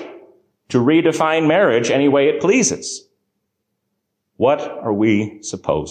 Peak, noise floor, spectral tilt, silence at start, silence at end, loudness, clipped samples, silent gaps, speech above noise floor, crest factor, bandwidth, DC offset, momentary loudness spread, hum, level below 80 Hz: -4 dBFS; -74 dBFS; -4.5 dB/octave; 0 s; 0 s; -17 LUFS; under 0.1%; none; 58 dB; 14 dB; 10 kHz; under 0.1%; 12 LU; none; -52 dBFS